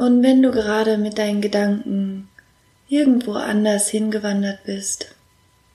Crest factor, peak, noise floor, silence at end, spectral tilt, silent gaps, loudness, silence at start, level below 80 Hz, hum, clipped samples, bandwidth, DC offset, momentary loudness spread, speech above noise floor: 16 dB; -4 dBFS; -57 dBFS; 0.7 s; -4.5 dB/octave; none; -19 LUFS; 0 s; -56 dBFS; none; under 0.1%; 14 kHz; under 0.1%; 11 LU; 39 dB